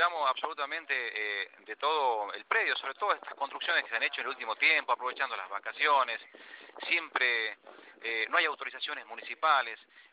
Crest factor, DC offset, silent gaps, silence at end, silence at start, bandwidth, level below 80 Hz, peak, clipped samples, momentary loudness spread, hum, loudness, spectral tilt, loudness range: 22 dB; under 0.1%; none; 0.1 s; 0 s; 4 kHz; under -90 dBFS; -12 dBFS; under 0.1%; 12 LU; none; -30 LUFS; 5 dB/octave; 2 LU